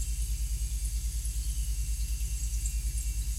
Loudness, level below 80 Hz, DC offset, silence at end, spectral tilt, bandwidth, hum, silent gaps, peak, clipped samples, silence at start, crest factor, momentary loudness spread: -34 LUFS; -32 dBFS; under 0.1%; 0 s; -3 dB/octave; 16 kHz; 50 Hz at -35 dBFS; none; -18 dBFS; under 0.1%; 0 s; 12 dB; 1 LU